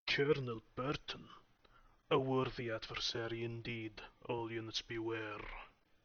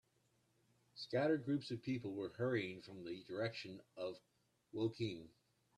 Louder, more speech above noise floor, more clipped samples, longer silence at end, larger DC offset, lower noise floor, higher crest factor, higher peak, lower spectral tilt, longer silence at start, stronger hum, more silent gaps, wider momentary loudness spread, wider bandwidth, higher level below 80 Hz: first, -40 LUFS vs -43 LUFS; second, 27 dB vs 37 dB; neither; second, 0.35 s vs 0.5 s; neither; second, -67 dBFS vs -79 dBFS; about the same, 20 dB vs 18 dB; first, -20 dBFS vs -26 dBFS; second, -3.5 dB/octave vs -7 dB/octave; second, 0.05 s vs 0.95 s; neither; neither; about the same, 15 LU vs 15 LU; second, 6.8 kHz vs 12 kHz; first, -62 dBFS vs -80 dBFS